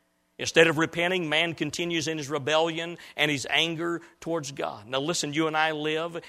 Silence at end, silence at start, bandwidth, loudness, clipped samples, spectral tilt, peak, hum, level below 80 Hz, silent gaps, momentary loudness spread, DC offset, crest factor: 0 s; 0.4 s; 15 kHz; -26 LUFS; under 0.1%; -3.5 dB/octave; -2 dBFS; none; -66 dBFS; none; 11 LU; under 0.1%; 26 dB